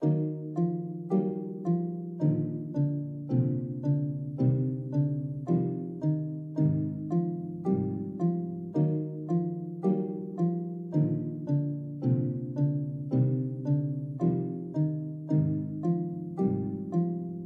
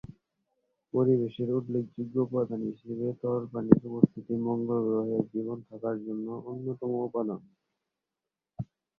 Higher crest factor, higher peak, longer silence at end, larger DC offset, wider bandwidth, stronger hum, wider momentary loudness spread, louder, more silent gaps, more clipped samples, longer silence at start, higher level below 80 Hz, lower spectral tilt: second, 14 dB vs 28 dB; second, -14 dBFS vs -2 dBFS; second, 0 s vs 0.35 s; neither; second, 2.3 kHz vs 3.7 kHz; neither; second, 6 LU vs 12 LU; about the same, -30 LUFS vs -30 LUFS; neither; neither; about the same, 0 s vs 0.1 s; about the same, -66 dBFS vs -64 dBFS; about the same, -12.5 dB/octave vs -12 dB/octave